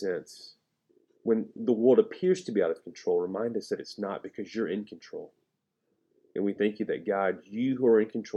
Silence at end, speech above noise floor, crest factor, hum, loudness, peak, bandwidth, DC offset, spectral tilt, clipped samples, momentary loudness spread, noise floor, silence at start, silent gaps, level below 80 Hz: 0 s; 51 dB; 20 dB; none; -29 LUFS; -10 dBFS; 11 kHz; under 0.1%; -6.5 dB/octave; under 0.1%; 15 LU; -79 dBFS; 0 s; none; -80 dBFS